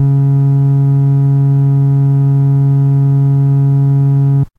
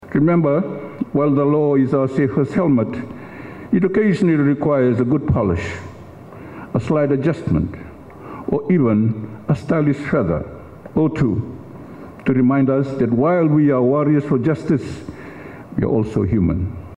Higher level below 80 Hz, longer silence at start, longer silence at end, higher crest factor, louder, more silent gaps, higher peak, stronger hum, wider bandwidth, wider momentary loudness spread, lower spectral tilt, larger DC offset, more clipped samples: about the same, -46 dBFS vs -44 dBFS; about the same, 0 s vs 0 s; about the same, 0.15 s vs 0.05 s; second, 6 dB vs 12 dB; first, -11 LUFS vs -18 LUFS; neither; about the same, -4 dBFS vs -6 dBFS; neither; second, 1.9 kHz vs 9.8 kHz; second, 0 LU vs 20 LU; first, -12 dB/octave vs -9.5 dB/octave; neither; neither